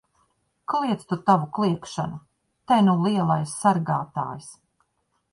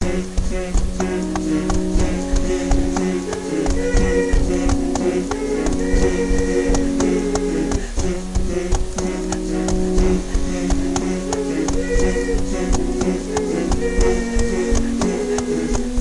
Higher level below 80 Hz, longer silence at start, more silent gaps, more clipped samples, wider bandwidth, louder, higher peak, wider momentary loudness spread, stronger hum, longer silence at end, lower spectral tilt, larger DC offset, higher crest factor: second, -62 dBFS vs -22 dBFS; first, 0.7 s vs 0 s; neither; neither; about the same, 11.5 kHz vs 11.5 kHz; about the same, -23 LUFS vs -21 LUFS; about the same, -6 dBFS vs -6 dBFS; first, 13 LU vs 5 LU; neither; first, 0.8 s vs 0 s; about the same, -6.5 dB/octave vs -5.5 dB/octave; second, under 0.1% vs 0.4%; first, 20 dB vs 12 dB